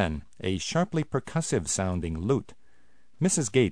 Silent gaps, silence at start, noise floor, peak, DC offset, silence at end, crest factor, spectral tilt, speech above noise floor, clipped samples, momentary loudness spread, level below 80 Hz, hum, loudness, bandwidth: none; 0 s; -66 dBFS; -10 dBFS; 0.4%; 0 s; 18 dB; -5 dB/octave; 39 dB; under 0.1%; 6 LU; -48 dBFS; none; -28 LUFS; 10.5 kHz